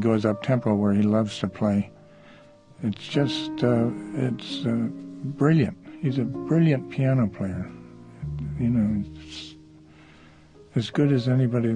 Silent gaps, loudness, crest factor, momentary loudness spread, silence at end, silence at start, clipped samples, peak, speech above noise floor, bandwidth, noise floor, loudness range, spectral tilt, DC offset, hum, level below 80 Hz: none; -25 LUFS; 18 dB; 14 LU; 0 s; 0 s; under 0.1%; -8 dBFS; 27 dB; 9.8 kHz; -51 dBFS; 4 LU; -8 dB/octave; under 0.1%; none; -50 dBFS